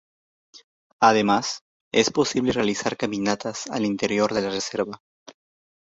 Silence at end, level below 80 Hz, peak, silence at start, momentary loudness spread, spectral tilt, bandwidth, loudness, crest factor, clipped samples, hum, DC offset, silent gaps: 0.65 s; -60 dBFS; -2 dBFS; 0.55 s; 10 LU; -4 dB/octave; 8 kHz; -23 LUFS; 22 dB; under 0.1%; none; under 0.1%; 0.64-0.99 s, 1.61-1.91 s, 5.00-5.26 s